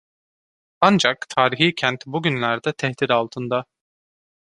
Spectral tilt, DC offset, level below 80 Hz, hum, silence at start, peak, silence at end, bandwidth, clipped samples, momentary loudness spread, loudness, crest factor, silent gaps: -4.5 dB/octave; under 0.1%; -62 dBFS; none; 0.8 s; -2 dBFS; 0.85 s; 11 kHz; under 0.1%; 8 LU; -20 LUFS; 20 dB; none